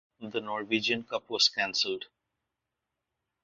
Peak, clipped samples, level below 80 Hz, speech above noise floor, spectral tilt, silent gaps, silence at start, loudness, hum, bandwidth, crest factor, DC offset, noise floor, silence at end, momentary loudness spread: -10 dBFS; under 0.1%; -76 dBFS; 55 dB; 0 dB/octave; none; 0.2 s; -29 LUFS; none; 7.4 kHz; 22 dB; under 0.1%; -86 dBFS; 1.4 s; 12 LU